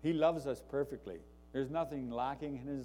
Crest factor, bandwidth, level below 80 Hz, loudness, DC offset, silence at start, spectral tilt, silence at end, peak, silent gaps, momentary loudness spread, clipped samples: 18 dB; 16.5 kHz; -60 dBFS; -38 LUFS; under 0.1%; 0 s; -7 dB/octave; 0 s; -20 dBFS; none; 13 LU; under 0.1%